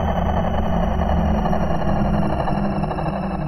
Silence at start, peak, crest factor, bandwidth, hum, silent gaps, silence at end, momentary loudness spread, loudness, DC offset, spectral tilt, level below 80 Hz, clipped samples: 0 s; -6 dBFS; 12 dB; 12 kHz; none; none; 0 s; 3 LU; -21 LUFS; under 0.1%; -8.5 dB/octave; -26 dBFS; under 0.1%